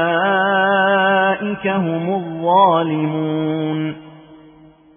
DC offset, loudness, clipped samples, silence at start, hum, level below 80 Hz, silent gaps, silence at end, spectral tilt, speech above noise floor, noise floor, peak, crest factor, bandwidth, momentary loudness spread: under 0.1%; -17 LUFS; under 0.1%; 0 s; none; -62 dBFS; none; 0.6 s; -10 dB/octave; 29 dB; -46 dBFS; -2 dBFS; 16 dB; 3.6 kHz; 8 LU